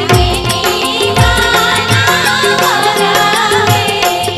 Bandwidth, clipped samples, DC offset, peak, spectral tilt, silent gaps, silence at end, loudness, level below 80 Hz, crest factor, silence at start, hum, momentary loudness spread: 15.5 kHz; under 0.1%; under 0.1%; 0 dBFS; -3.5 dB/octave; none; 0 s; -10 LUFS; -26 dBFS; 10 dB; 0 s; none; 3 LU